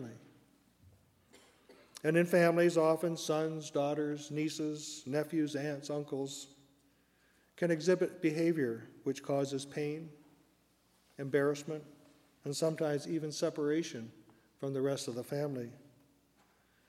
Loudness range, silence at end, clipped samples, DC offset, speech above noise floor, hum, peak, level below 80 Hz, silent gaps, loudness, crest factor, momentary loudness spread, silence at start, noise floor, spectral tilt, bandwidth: 6 LU; 1.1 s; under 0.1%; under 0.1%; 37 dB; none; -16 dBFS; -82 dBFS; none; -35 LUFS; 20 dB; 15 LU; 0 s; -71 dBFS; -5.5 dB/octave; 16 kHz